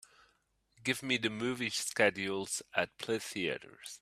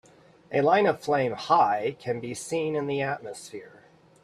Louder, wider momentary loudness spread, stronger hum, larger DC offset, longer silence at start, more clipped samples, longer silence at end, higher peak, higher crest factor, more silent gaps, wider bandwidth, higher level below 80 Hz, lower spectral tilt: second, -34 LUFS vs -26 LUFS; second, 7 LU vs 16 LU; neither; neither; first, 0.8 s vs 0.5 s; neither; second, 0.05 s vs 0.55 s; second, -12 dBFS vs -8 dBFS; about the same, 24 dB vs 20 dB; neither; first, 15.5 kHz vs 13.5 kHz; second, -74 dBFS vs -68 dBFS; second, -3 dB/octave vs -5 dB/octave